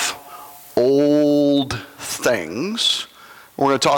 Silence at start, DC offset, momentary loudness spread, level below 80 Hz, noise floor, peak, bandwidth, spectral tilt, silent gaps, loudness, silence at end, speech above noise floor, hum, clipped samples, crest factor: 0 s; under 0.1%; 19 LU; -56 dBFS; -39 dBFS; -4 dBFS; 18.5 kHz; -3.5 dB/octave; none; -19 LUFS; 0 s; 22 dB; none; under 0.1%; 14 dB